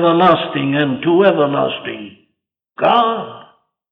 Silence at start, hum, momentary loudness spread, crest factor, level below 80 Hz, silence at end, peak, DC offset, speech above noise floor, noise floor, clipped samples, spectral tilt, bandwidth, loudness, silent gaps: 0 s; none; 14 LU; 14 dB; -60 dBFS; 0.5 s; -2 dBFS; under 0.1%; 58 dB; -72 dBFS; under 0.1%; -8.5 dB/octave; 5.2 kHz; -15 LUFS; none